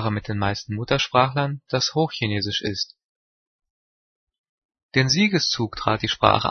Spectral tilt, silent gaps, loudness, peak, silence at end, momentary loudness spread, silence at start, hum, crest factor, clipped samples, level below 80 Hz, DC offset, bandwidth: -4.5 dB/octave; 3.04-3.59 s, 3.70-4.27 s, 4.39-4.69 s, 4.83-4.89 s; -22 LUFS; 0 dBFS; 0 s; 8 LU; 0 s; none; 24 dB; under 0.1%; -50 dBFS; under 0.1%; 6.6 kHz